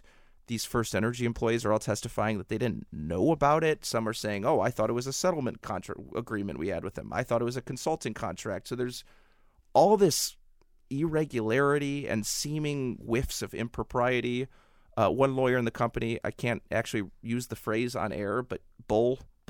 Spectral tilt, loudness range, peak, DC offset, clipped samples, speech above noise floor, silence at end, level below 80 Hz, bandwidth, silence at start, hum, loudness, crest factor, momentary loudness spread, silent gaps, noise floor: -5 dB/octave; 5 LU; -10 dBFS; under 0.1%; under 0.1%; 32 dB; 0.25 s; -52 dBFS; 17 kHz; 0.5 s; none; -30 LUFS; 20 dB; 10 LU; none; -61 dBFS